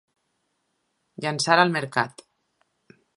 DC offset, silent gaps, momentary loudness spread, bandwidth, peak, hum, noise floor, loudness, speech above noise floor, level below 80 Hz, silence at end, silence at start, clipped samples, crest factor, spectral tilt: under 0.1%; none; 12 LU; 11.5 kHz; -2 dBFS; none; -74 dBFS; -23 LUFS; 52 dB; -76 dBFS; 1.05 s; 1.2 s; under 0.1%; 26 dB; -4 dB/octave